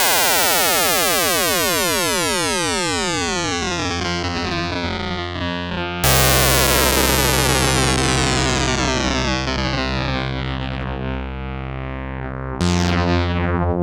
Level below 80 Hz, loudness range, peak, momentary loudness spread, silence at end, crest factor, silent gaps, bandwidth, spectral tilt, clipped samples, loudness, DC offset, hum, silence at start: -30 dBFS; 7 LU; -4 dBFS; 12 LU; 0 s; 14 dB; none; over 20 kHz; -3 dB/octave; under 0.1%; -18 LUFS; under 0.1%; none; 0 s